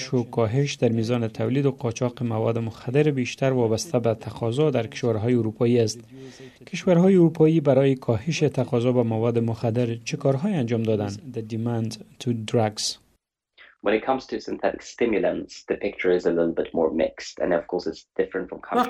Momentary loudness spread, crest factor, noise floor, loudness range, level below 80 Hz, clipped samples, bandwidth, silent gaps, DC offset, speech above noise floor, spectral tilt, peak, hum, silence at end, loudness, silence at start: 10 LU; 18 dB; -69 dBFS; 6 LU; -58 dBFS; under 0.1%; 13 kHz; none; under 0.1%; 46 dB; -6.5 dB/octave; -6 dBFS; none; 0 s; -24 LUFS; 0 s